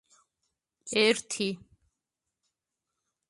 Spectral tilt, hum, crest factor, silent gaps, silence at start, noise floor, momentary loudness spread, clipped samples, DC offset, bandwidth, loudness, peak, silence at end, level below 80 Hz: -2.5 dB/octave; none; 24 dB; none; 0.85 s; -87 dBFS; 19 LU; under 0.1%; under 0.1%; 11.5 kHz; -27 LUFS; -10 dBFS; 1.7 s; -74 dBFS